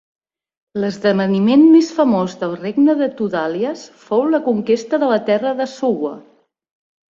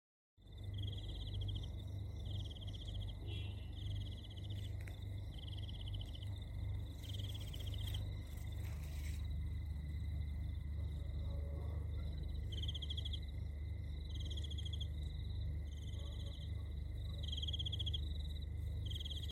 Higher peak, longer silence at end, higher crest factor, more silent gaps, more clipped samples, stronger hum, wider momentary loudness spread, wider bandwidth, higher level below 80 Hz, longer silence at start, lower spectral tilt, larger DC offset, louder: first, -2 dBFS vs -30 dBFS; first, 0.9 s vs 0 s; about the same, 14 dB vs 14 dB; neither; neither; neither; first, 12 LU vs 5 LU; second, 7.6 kHz vs 15.5 kHz; second, -62 dBFS vs -48 dBFS; first, 0.75 s vs 0.4 s; about the same, -6.5 dB/octave vs -5.5 dB/octave; neither; first, -16 LUFS vs -45 LUFS